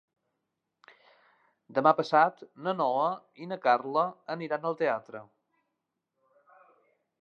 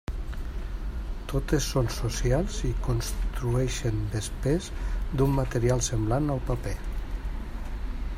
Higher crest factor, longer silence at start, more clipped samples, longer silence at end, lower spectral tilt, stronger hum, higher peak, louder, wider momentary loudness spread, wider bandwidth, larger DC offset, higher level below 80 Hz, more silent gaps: first, 24 dB vs 16 dB; first, 1.7 s vs 0.1 s; neither; first, 2 s vs 0 s; about the same, -6.5 dB/octave vs -5.5 dB/octave; neither; about the same, -8 dBFS vs -10 dBFS; about the same, -28 LUFS vs -29 LUFS; first, 14 LU vs 11 LU; second, 7 kHz vs 16 kHz; neither; second, -88 dBFS vs -32 dBFS; neither